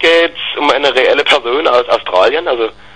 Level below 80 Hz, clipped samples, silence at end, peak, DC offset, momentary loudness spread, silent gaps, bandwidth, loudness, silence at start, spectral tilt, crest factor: -48 dBFS; 0.1%; 0.25 s; 0 dBFS; 1%; 5 LU; none; 10 kHz; -11 LUFS; 0 s; -2.5 dB/octave; 12 dB